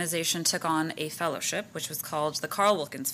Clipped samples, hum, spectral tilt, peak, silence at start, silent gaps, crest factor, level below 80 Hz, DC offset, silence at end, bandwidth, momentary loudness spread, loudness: under 0.1%; none; -2.5 dB/octave; -10 dBFS; 0 s; none; 20 dB; -72 dBFS; under 0.1%; 0 s; 15.5 kHz; 7 LU; -28 LUFS